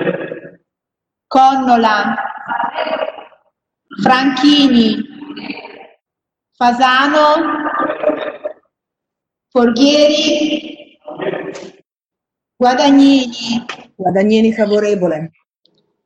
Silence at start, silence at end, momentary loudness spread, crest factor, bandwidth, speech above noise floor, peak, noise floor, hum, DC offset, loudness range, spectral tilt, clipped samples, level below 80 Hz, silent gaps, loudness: 0 s; 0.8 s; 19 LU; 14 dB; 8.4 kHz; 73 dB; 0 dBFS; -85 dBFS; none; under 0.1%; 2 LU; -4.5 dB/octave; under 0.1%; -54 dBFS; none; -13 LUFS